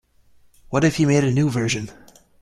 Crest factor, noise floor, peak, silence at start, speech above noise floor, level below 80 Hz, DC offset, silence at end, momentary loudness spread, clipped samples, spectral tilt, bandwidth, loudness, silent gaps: 18 dB; -54 dBFS; -4 dBFS; 0.7 s; 35 dB; -50 dBFS; under 0.1%; 0.5 s; 9 LU; under 0.1%; -6 dB/octave; 13 kHz; -20 LUFS; none